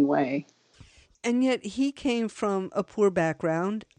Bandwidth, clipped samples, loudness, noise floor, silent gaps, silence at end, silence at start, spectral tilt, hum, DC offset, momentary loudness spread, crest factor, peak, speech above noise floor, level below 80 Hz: 10 kHz; under 0.1%; -27 LUFS; -55 dBFS; none; 0.15 s; 0 s; -6 dB/octave; none; under 0.1%; 6 LU; 14 dB; -14 dBFS; 28 dB; -62 dBFS